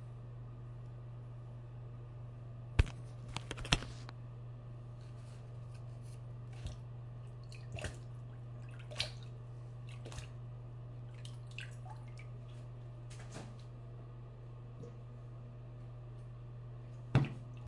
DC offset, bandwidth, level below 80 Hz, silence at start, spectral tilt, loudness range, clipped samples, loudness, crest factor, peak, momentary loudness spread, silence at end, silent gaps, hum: under 0.1%; 11.5 kHz; -52 dBFS; 0 s; -5 dB/octave; 9 LU; under 0.1%; -45 LUFS; 38 dB; -6 dBFS; 14 LU; 0 s; none; none